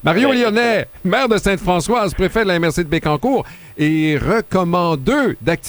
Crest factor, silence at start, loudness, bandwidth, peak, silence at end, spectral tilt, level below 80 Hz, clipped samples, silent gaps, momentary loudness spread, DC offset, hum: 14 dB; 0 s; -16 LUFS; over 20 kHz; -2 dBFS; 0 s; -5.5 dB/octave; -36 dBFS; under 0.1%; none; 4 LU; under 0.1%; none